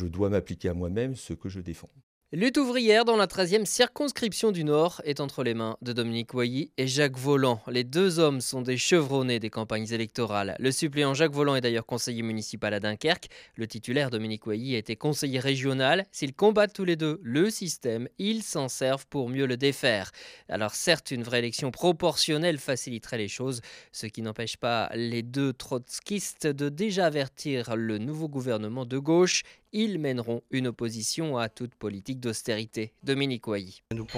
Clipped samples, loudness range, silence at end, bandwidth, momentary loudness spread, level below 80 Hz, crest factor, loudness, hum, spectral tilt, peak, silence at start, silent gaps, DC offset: under 0.1%; 5 LU; 0 s; 15.5 kHz; 10 LU; -60 dBFS; 20 dB; -28 LUFS; none; -4.5 dB/octave; -8 dBFS; 0 s; 2.03-2.21 s; under 0.1%